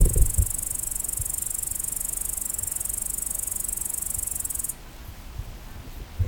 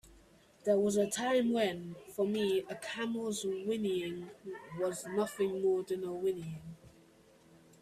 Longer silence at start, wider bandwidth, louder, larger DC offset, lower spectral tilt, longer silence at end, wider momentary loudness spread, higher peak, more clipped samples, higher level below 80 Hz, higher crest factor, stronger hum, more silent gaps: about the same, 0 s vs 0.05 s; first, over 20 kHz vs 14.5 kHz; first, -26 LUFS vs -34 LUFS; neither; second, -3 dB/octave vs -4.5 dB/octave; second, 0 s vs 0.95 s; about the same, 16 LU vs 14 LU; first, -4 dBFS vs -18 dBFS; neither; first, -32 dBFS vs -70 dBFS; first, 22 dB vs 16 dB; neither; neither